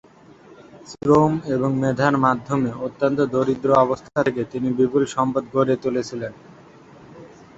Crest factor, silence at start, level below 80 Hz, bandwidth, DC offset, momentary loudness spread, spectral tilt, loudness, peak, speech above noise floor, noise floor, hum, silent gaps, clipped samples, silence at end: 18 dB; 0.75 s; -54 dBFS; 8 kHz; under 0.1%; 9 LU; -7 dB/octave; -21 LUFS; -2 dBFS; 27 dB; -47 dBFS; none; none; under 0.1%; 0.3 s